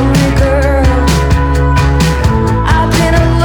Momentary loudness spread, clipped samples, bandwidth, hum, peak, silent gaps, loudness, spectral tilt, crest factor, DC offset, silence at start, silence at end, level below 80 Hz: 2 LU; under 0.1%; 18 kHz; none; 0 dBFS; none; -10 LUFS; -6 dB/octave; 8 dB; under 0.1%; 0 s; 0 s; -14 dBFS